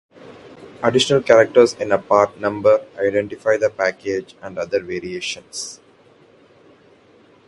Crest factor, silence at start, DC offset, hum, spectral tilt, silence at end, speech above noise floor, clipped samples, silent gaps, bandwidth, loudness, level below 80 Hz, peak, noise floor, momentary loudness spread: 20 dB; 0.25 s; under 0.1%; none; -4 dB/octave; 1.7 s; 33 dB; under 0.1%; none; 11.5 kHz; -18 LUFS; -58 dBFS; 0 dBFS; -51 dBFS; 15 LU